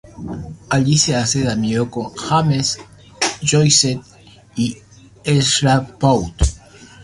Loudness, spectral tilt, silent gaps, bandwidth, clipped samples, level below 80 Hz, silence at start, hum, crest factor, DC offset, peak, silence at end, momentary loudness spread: -17 LUFS; -4 dB/octave; none; 11.5 kHz; under 0.1%; -32 dBFS; 0.15 s; none; 18 dB; under 0.1%; 0 dBFS; 0 s; 15 LU